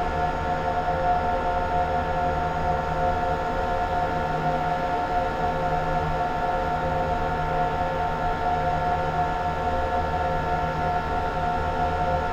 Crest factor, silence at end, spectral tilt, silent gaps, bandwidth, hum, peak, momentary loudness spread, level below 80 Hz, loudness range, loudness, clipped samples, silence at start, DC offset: 12 dB; 0 s; -6.5 dB/octave; none; 14 kHz; none; -12 dBFS; 1 LU; -34 dBFS; 1 LU; -25 LUFS; under 0.1%; 0 s; under 0.1%